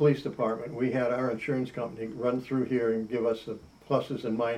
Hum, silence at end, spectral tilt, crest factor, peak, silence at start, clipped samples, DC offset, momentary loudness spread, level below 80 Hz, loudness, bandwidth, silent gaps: none; 0 s; -8 dB/octave; 18 dB; -12 dBFS; 0 s; under 0.1%; under 0.1%; 8 LU; -64 dBFS; -30 LUFS; 11 kHz; none